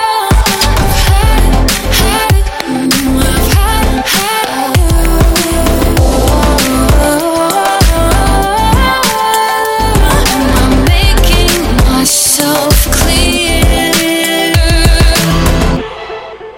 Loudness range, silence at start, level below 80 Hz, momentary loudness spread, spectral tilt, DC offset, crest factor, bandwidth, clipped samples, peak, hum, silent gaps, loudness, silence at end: 2 LU; 0 s; -12 dBFS; 3 LU; -4 dB/octave; under 0.1%; 8 dB; 17.5 kHz; under 0.1%; 0 dBFS; none; none; -9 LUFS; 0 s